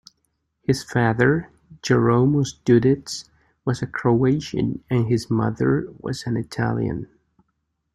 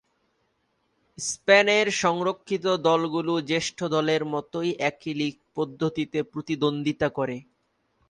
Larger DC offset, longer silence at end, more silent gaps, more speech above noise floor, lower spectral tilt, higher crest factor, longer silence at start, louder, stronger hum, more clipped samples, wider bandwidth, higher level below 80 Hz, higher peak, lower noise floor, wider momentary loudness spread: neither; first, 0.9 s vs 0.65 s; neither; first, 53 dB vs 47 dB; first, -7 dB/octave vs -4 dB/octave; about the same, 18 dB vs 22 dB; second, 0.7 s vs 1.2 s; first, -22 LUFS vs -25 LUFS; neither; neither; about the same, 12.5 kHz vs 11.5 kHz; first, -50 dBFS vs -64 dBFS; about the same, -4 dBFS vs -4 dBFS; about the same, -74 dBFS vs -72 dBFS; about the same, 12 LU vs 11 LU